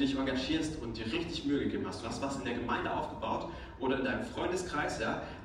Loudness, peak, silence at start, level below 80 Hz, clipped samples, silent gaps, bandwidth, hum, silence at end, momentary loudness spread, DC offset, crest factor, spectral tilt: -35 LUFS; -20 dBFS; 0 s; -52 dBFS; under 0.1%; none; 11.5 kHz; none; 0 s; 5 LU; under 0.1%; 16 dB; -5 dB/octave